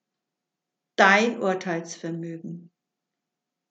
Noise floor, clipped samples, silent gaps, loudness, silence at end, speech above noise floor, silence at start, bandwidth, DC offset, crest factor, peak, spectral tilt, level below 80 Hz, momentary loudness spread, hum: -85 dBFS; under 0.1%; none; -22 LUFS; 1.1 s; 62 dB; 1 s; 8.4 kHz; under 0.1%; 24 dB; -2 dBFS; -4.5 dB/octave; under -90 dBFS; 21 LU; none